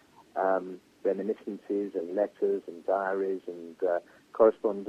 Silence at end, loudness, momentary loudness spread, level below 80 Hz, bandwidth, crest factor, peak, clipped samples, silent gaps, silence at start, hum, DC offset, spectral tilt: 0 s; -30 LUFS; 12 LU; -76 dBFS; 8.4 kHz; 22 dB; -8 dBFS; under 0.1%; none; 0.35 s; none; under 0.1%; -8 dB/octave